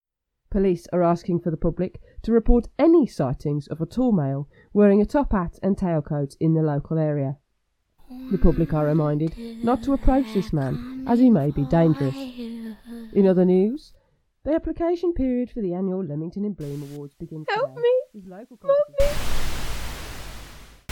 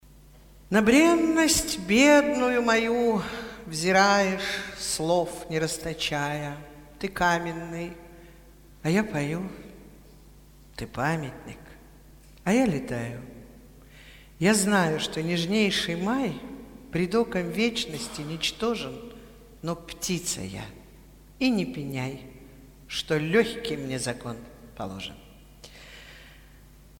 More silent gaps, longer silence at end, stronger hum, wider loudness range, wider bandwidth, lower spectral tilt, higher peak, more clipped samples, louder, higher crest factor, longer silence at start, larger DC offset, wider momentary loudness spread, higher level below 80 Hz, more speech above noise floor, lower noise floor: neither; second, 0.25 s vs 0.65 s; neither; second, 5 LU vs 10 LU; about the same, 18.5 kHz vs 18 kHz; first, -8 dB/octave vs -4 dB/octave; about the same, -4 dBFS vs -6 dBFS; neither; about the same, -23 LUFS vs -25 LUFS; about the same, 20 dB vs 20 dB; about the same, 0.5 s vs 0.55 s; neither; second, 16 LU vs 21 LU; first, -32 dBFS vs -52 dBFS; first, 50 dB vs 26 dB; first, -72 dBFS vs -51 dBFS